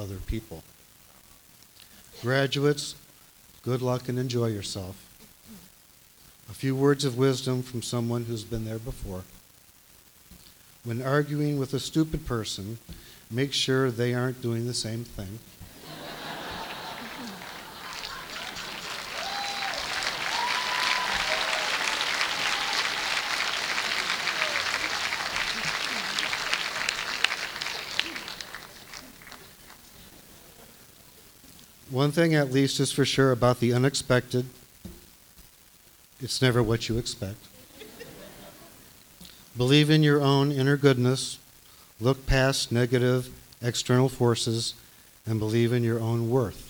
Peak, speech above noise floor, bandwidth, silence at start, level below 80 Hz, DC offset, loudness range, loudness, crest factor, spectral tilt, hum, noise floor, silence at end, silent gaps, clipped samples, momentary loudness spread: -2 dBFS; 30 dB; over 20 kHz; 0 s; -48 dBFS; under 0.1%; 10 LU; -27 LUFS; 26 dB; -4.5 dB/octave; none; -56 dBFS; 0 s; none; under 0.1%; 21 LU